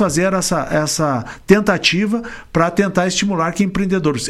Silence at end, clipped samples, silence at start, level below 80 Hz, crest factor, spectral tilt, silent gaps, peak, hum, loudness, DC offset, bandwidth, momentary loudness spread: 0 s; under 0.1%; 0 s; -40 dBFS; 16 dB; -4.5 dB/octave; none; 0 dBFS; none; -17 LUFS; under 0.1%; 13.5 kHz; 6 LU